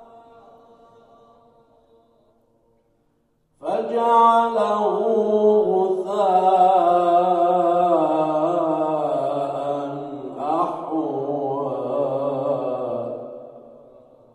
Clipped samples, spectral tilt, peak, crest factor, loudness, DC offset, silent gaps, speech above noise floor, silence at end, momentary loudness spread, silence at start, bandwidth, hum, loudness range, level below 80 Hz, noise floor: under 0.1%; -7.5 dB/octave; -4 dBFS; 16 dB; -20 LUFS; under 0.1%; none; 48 dB; 0.6 s; 12 LU; 0 s; 10.5 kHz; none; 8 LU; -70 dBFS; -66 dBFS